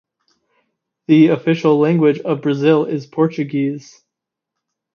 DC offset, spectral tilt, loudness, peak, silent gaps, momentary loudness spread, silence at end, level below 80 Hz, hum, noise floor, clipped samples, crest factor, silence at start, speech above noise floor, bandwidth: under 0.1%; -8 dB/octave; -16 LUFS; 0 dBFS; none; 10 LU; 1.15 s; -70 dBFS; none; -82 dBFS; under 0.1%; 16 dB; 1.1 s; 67 dB; 6.8 kHz